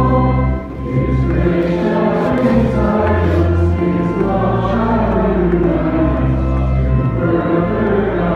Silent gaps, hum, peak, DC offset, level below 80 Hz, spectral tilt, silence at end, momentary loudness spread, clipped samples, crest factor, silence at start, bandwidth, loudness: none; none; -2 dBFS; under 0.1%; -22 dBFS; -9.5 dB/octave; 0 s; 2 LU; under 0.1%; 12 dB; 0 s; 6.4 kHz; -15 LUFS